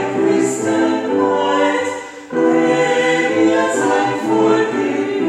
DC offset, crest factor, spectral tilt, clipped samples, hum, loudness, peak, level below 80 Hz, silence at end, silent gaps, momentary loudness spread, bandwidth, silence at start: under 0.1%; 12 dB; -4.5 dB/octave; under 0.1%; none; -16 LUFS; -2 dBFS; -64 dBFS; 0 s; none; 4 LU; 12 kHz; 0 s